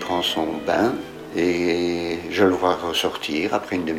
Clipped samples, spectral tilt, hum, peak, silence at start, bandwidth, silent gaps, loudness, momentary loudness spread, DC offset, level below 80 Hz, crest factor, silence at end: under 0.1%; -4.5 dB/octave; none; -4 dBFS; 0 s; 16 kHz; none; -22 LUFS; 6 LU; under 0.1%; -56 dBFS; 18 dB; 0 s